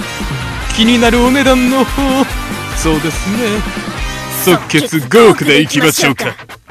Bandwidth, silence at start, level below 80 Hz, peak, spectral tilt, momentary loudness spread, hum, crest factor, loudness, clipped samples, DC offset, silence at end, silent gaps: 15 kHz; 0 s; -26 dBFS; 0 dBFS; -4 dB/octave; 12 LU; none; 12 dB; -12 LUFS; 0.4%; under 0.1%; 0.15 s; none